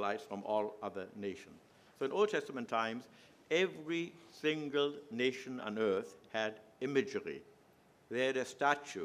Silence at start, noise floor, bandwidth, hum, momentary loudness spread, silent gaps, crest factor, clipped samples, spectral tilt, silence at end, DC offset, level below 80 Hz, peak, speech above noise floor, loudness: 0 s; -66 dBFS; 13.5 kHz; none; 10 LU; none; 22 dB; under 0.1%; -4.5 dB/octave; 0 s; under 0.1%; -84 dBFS; -16 dBFS; 29 dB; -37 LUFS